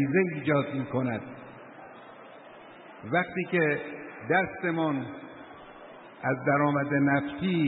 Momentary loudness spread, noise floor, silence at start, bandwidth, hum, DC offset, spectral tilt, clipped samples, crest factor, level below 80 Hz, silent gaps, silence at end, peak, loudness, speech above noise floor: 22 LU; -48 dBFS; 0 s; 4.1 kHz; none; under 0.1%; -11 dB/octave; under 0.1%; 18 dB; -66 dBFS; none; 0 s; -10 dBFS; -28 LUFS; 21 dB